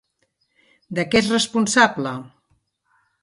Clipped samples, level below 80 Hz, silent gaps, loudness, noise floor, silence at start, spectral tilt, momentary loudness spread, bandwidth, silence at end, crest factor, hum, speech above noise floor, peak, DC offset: under 0.1%; -56 dBFS; none; -19 LUFS; -70 dBFS; 0.9 s; -3.5 dB/octave; 13 LU; 11.5 kHz; 0.95 s; 22 dB; none; 50 dB; -2 dBFS; under 0.1%